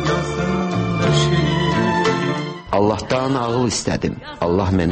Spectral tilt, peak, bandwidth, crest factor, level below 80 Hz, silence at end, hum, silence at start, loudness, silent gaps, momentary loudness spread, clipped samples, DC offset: -5.5 dB/octave; -4 dBFS; 8.8 kHz; 14 dB; -38 dBFS; 0 s; none; 0 s; -19 LUFS; none; 6 LU; under 0.1%; under 0.1%